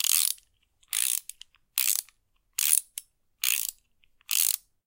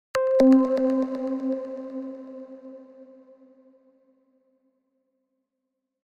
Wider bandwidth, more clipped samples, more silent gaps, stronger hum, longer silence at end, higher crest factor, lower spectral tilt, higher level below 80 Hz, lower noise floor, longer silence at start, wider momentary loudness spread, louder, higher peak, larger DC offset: first, 17.5 kHz vs 9.2 kHz; neither; neither; neither; second, 0.3 s vs 3 s; first, 28 dB vs 20 dB; second, 6.5 dB/octave vs -6 dB/octave; second, -74 dBFS vs -64 dBFS; second, -67 dBFS vs -82 dBFS; second, 0 s vs 0.15 s; second, 13 LU vs 25 LU; second, -26 LUFS vs -23 LUFS; first, -2 dBFS vs -6 dBFS; neither